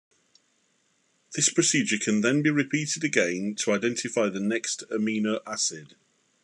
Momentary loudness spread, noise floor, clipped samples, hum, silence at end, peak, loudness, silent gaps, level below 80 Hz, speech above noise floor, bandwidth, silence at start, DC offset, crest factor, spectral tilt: 6 LU; -69 dBFS; under 0.1%; none; 0.6 s; -6 dBFS; -25 LUFS; none; -78 dBFS; 43 dB; 12 kHz; 1.3 s; under 0.1%; 20 dB; -3.5 dB/octave